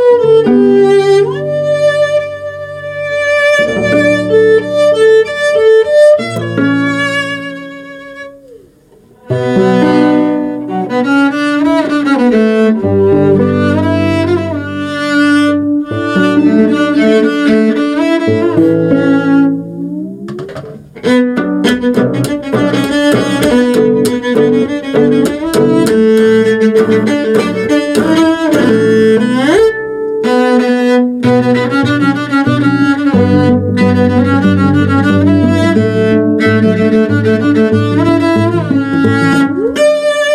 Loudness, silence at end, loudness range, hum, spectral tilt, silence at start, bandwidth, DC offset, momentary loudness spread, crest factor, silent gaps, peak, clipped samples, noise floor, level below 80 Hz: -10 LUFS; 0 s; 3 LU; none; -6.5 dB/octave; 0 s; 14.5 kHz; under 0.1%; 8 LU; 10 dB; none; 0 dBFS; under 0.1%; -43 dBFS; -46 dBFS